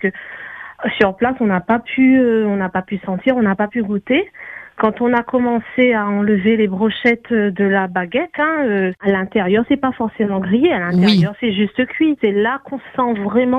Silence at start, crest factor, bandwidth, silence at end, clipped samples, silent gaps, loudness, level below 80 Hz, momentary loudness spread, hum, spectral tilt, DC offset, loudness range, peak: 0 s; 16 dB; 6.2 kHz; 0 s; under 0.1%; none; -16 LUFS; -52 dBFS; 8 LU; none; -8 dB/octave; under 0.1%; 1 LU; 0 dBFS